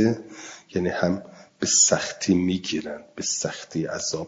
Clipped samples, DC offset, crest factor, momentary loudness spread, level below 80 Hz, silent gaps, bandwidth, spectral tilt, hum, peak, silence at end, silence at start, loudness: under 0.1%; under 0.1%; 20 dB; 15 LU; -62 dBFS; none; 7.8 kHz; -3 dB/octave; none; -4 dBFS; 0 s; 0 s; -24 LUFS